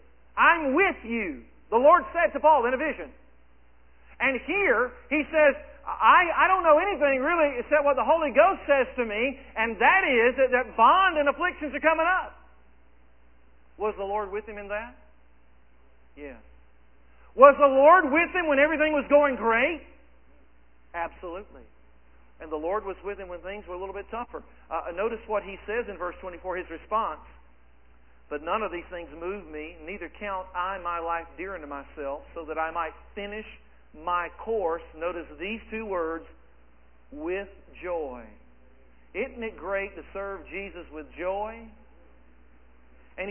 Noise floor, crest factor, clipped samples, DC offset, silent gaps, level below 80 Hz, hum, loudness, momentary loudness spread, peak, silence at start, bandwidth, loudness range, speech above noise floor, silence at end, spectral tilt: -60 dBFS; 26 dB; under 0.1%; 0.2%; none; -52 dBFS; none; -25 LUFS; 19 LU; 0 dBFS; 0.35 s; 3.3 kHz; 14 LU; 35 dB; 0 s; -7.5 dB/octave